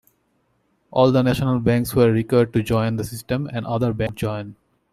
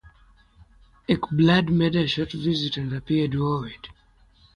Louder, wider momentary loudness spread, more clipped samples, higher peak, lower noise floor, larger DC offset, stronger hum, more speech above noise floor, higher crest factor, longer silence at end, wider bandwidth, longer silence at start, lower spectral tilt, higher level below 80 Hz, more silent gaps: first, -20 LUFS vs -23 LUFS; second, 10 LU vs 18 LU; neither; about the same, -4 dBFS vs -6 dBFS; first, -66 dBFS vs -58 dBFS; neither; neither; first, 47 dB vs 35 dB; about the same, 18 dB vs 18 dB; second, 0.4 s vs 0.65 s; first, 14.5 kHz vs 9.6 kHz; second, 0.9 s vs 1.1 s; about the same, -7 dB/octave vs -7.5 dB/octave; about the same, -46 dBFS vs -50 dBFS; neither